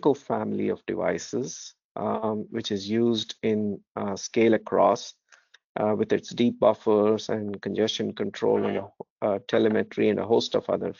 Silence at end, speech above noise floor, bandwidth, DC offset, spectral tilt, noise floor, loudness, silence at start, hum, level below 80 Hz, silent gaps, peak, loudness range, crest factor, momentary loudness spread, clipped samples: 0.05 s; 34 dB; 7.4 kHz; under 0.1%; -4.5 dB/octave; -59 dBFS; -26 LUFS; 0.05 s; none; -68 dBFS; 1.84-1.95 s, 3.89-3.95 s, 5.64-5.75 s, 9.10-9.16 s; -8 dBFS; 4 LU; 18 dB; 10 LU; under 0.1%